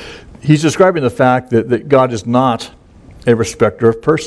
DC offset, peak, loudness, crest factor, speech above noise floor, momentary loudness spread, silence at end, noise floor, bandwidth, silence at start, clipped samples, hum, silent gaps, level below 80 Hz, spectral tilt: under 0.1%; 0 dBFS; -13 LUFS; 14 dB; 27 dB; 10 LU; 0 s; -39 dBFS; 11 kHz; 0 s; 0.1%; none; none; -44 dBFS; -6 dB/octave